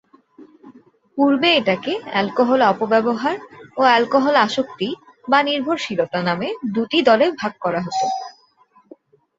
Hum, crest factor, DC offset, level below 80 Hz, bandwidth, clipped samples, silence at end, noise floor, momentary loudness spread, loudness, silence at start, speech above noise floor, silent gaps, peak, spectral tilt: none; 18 dB; under 0.1%; -64 dBFS; 8 kHz; under 0.1%; 1.05 s; -56 dBFS; 11 LU; -18 LUFS; 0.4 s; 38 dB; none; -2 dBFS; -5 dB/octave